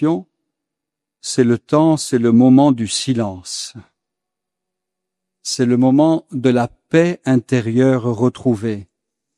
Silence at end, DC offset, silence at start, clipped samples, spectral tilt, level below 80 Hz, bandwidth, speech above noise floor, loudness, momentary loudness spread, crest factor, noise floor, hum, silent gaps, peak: 0.55 s; under 0.1%; 0 s; under 0.1%; -6 dB/octave; -60 dBFS; 12 kHz; 68 dB; -16 LUFS; 13 LU; 16 dB; -83 dBFS; none; none; 0 dBFS